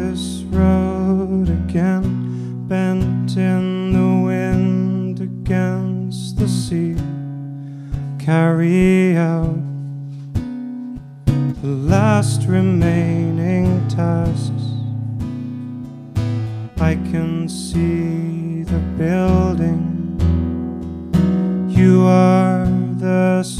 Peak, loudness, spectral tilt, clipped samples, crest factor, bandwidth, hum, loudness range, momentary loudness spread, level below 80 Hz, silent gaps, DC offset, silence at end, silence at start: 0 dBFS; -18 LUFS; -8 dB/octave; under 0.1%; 16 dB; 12 kHz; none; 6 LU; 12 LU; -32 dBFS; none; under 0.1%; 0 s; 0 s